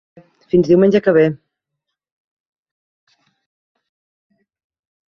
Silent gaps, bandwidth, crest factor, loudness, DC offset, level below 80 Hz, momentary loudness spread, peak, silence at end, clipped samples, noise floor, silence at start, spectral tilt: none; 6.4 kHz; 18 dB; -14 LUFS; under 0.1%; -54 dBFS; 6 LU; -2 dBFS; 3.7 s; under 0.1%; -79 dBFS; 0.55 s; -8.5 dB/octave